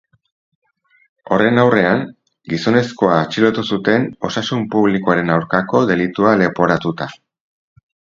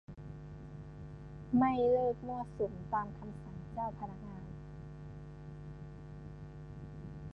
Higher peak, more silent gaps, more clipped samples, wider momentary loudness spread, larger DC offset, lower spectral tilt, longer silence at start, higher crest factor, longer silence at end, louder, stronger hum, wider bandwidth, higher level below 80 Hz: first, 0 dBFS vs -18 dBFS; neither; neither; second, 8 LU vs 19 LU; neither; second, -6.5 dB/octave vs -9.5 dB/octave; first, 1.3 s vs 0.1 s; about the same, 16 dB vs 20 dB; first, 1 s vs 0 s; first, -16 LUFS vs -36 LUFS; neither; first, 7.6 kHz vs 6.4 kHz; about the same, -52 dBFS vs -56 dBFS